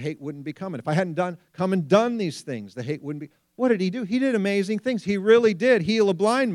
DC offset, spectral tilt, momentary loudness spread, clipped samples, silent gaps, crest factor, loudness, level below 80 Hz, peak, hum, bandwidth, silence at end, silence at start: under 0.1%; -6.5 dB/octave; 15 LU; under 0.1%; none; 18 dB; -23 LUFS; -68 dBFS; -4 dBFS; none; 12 kHz; 0 s; 0 s